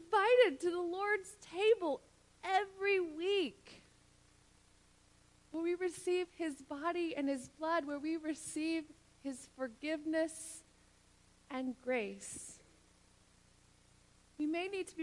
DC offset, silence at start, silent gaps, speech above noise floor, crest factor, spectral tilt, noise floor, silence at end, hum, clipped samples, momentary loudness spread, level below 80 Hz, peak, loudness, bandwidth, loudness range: under 0.1%; 0 s; none; 29 dB; 22 dB; -3 dB/octave; -67 dBFS; 0 s; 60 Hz at -75 dBFS; under 0.1%; 15 LU; -74 dBFS; -18 dBFS; -37 LUFS; 11.5 kHz; 9 LU